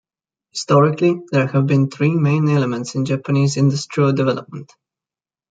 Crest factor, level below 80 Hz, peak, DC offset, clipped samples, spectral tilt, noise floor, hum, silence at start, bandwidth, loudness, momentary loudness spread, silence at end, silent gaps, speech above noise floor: 16 dB; -60 dBFS; -2 dBFS; under 0.1%; under 0.1%; -7 dB/octave; under -90 dBFS; none; 0.55 s; 9 kHz; -17 LUFS; 10 LU; 0.85 s; none; over 73 dB